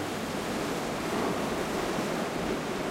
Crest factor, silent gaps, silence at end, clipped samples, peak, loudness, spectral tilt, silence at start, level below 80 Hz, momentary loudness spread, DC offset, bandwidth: 14 dB; none; 0 s; under 0.1%; -18 dBFS; -31 LUFS; -4.5 dB/octave; 0 s; -52 dBFS; 2 LU; under 0.1%; 16 kHz